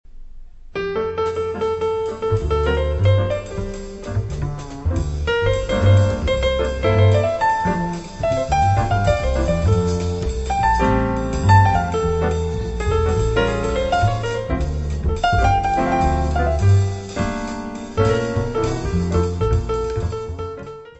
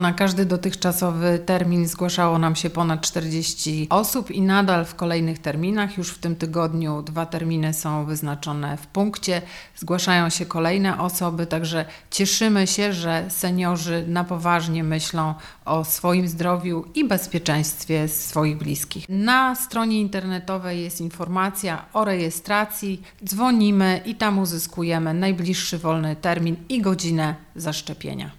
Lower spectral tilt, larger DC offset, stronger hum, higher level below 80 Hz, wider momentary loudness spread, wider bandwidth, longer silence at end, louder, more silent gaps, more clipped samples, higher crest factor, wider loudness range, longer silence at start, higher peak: first, -6.5 dB/octave vs -4.5 dB/octave; first, 0.2% vs under 0.1%; neither; first, -26 dBFS vs -52 dBFS; about the same, 10 LU vs 9 LU; second, 8.2 kHz vs 16.5 kHz; about the same, 0.1 s vs 0.05 s; about the same, -20 LUFS vs -22 LUFS; neither; neither; about the same, 18 dB vs 18 dB; about the same, 4 LU vs 3 LU; about the same, 0.1 s vs 0 s; about the same, -2 dBFS vs -4 dBFS